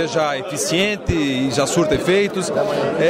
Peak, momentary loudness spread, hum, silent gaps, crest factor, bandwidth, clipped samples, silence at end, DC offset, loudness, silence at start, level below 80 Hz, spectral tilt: -6 dBFS; 4 LU; none; none; 12 dB; 16 kHz; under 0.1%; 0 s; under 0.1%; -19 LUFS; 0 s; -42 dBFS; -4.5 dB/octave